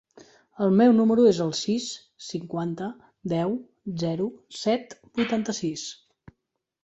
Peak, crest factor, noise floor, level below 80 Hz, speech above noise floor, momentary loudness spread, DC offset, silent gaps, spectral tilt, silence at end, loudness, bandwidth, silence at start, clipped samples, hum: -8 dBFS; 18 dB; -80 dBFS; -64 dBFS; 56 dB; 17 LU; under 0.1%; none; -5.5 dB/octave; 0.9 s; -25 LUFS; 8.2 kHz; 0.6 s; under 0.1%; none